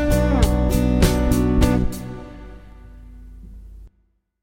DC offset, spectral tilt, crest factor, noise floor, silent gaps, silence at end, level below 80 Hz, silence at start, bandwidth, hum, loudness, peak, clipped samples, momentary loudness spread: under 0.1%; -6.5 dB/octave; 18 dB; -64 dBFS; none; 0.55 s; -24 dBFS; 0 s; 17 kHz; none; -19 LUFS; -2 dBFS; under 0.1%; 18 LU